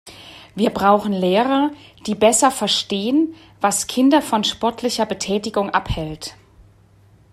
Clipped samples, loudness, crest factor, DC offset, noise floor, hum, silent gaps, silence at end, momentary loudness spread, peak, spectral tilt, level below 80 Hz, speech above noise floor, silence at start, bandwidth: under 0.1%; -19 LUFS; 18 dB; under 0.1%; -51 dBFS; none; none; 1 s; 13 LU; -2 dBFS; -3.5 dB/octave; -44 dBFS; 33 dB; 0.05 s; 15.5 kHz